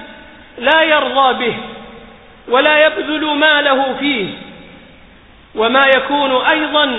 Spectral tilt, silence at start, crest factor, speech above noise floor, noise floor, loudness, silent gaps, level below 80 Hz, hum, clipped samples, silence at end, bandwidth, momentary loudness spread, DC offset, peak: -6 dB/octave; 0 s; 14 dB; 29 dB; -43 dBFS; -13 LUFS; none; -50 dBFS; none; under 0.1%; 0 s; 4 kHz; 15 LU; under 0.1%; 0 dBFS